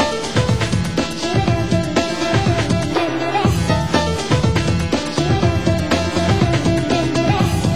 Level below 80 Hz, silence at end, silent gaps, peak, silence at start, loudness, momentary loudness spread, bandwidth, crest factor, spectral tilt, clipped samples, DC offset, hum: -30 dBFS; 0 s; none; -2 dBFS; 0 s; -18 LUFS; 3 LU; 16 kHz; 16 dB; -5.5 dB/octave; under 0.1%; 2%; none